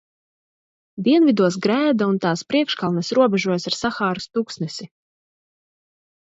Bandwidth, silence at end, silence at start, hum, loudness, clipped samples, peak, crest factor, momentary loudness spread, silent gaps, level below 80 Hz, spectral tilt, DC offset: 8 kHz; 1.35 s; 0.95 s; none; -20 LUFS; under 0.1%; -4 dBFS; 18 dB; 11 LU; none; -62 dBFS; -5.5 dB/octave; under 0.1%